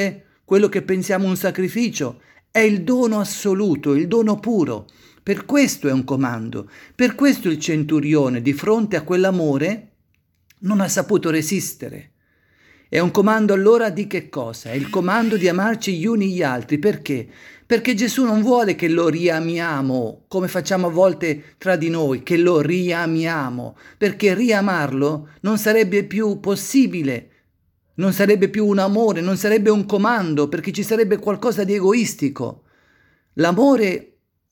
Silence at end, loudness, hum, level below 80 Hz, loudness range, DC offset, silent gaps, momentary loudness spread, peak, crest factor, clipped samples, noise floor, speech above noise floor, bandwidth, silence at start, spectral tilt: 0.5 s; -19 LUFS; none; -62 dBFS; 2 LU; under 0.1%; none; 9 LU; -2 dBFS; 16 dB; under 0.1%; -65 dBFS; 46 dB; 18 kHz; 0 s; -5.5 dB/octave